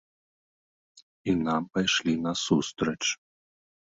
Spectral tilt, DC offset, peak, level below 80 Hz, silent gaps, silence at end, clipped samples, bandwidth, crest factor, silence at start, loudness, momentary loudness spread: -4 dB/octave; under 0.1%; -10 dBFS; -60 dBFS; 1.02-1.24 s; 0.8 s; under 0.1%; 8 kHz; 20 dB; 0.95 s; -27 LUFS; 5 LU